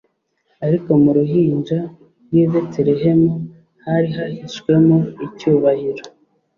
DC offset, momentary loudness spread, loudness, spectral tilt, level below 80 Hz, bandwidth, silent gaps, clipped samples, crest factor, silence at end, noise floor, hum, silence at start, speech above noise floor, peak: under 0.1%; 13 LU; -17 LUFS; -9 dB/octave; -56 dBFS; 7 kHz; none; under 0.1%; 14 dB; 0.5 s; -65 dBFS; none; 0.6 s; 49 dB; -2 dBFS